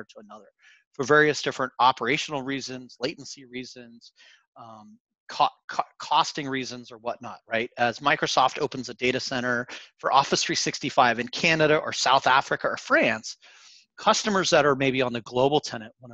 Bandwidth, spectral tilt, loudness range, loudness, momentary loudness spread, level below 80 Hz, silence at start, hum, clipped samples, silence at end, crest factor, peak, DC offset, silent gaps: 8.6 kHz; -3 dB/octave; 8 LU; -24 LUFS; 16 LU; -64 dBFS; 0 s; none; under 0.1%; 0 s; 20 dB; -6 dBFS; under 0.1%; 0.87-0.91 s, 4.47-4.53 s, 5.00-5.05 s, 5.20-5.27 s, 5.64-5.68 s